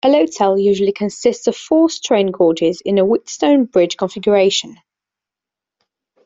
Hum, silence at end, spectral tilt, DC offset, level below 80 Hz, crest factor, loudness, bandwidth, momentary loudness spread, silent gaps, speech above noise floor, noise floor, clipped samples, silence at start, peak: none; 1.5 s; -4.5 dB/octave; under 0.1%; -58 dBFS; 14 dB; -15 LUFS; 7.8 kHz; 5 LU; none; 72 dB; -87 dBFS; under 0.1%; 0.05 s; -2 dBFS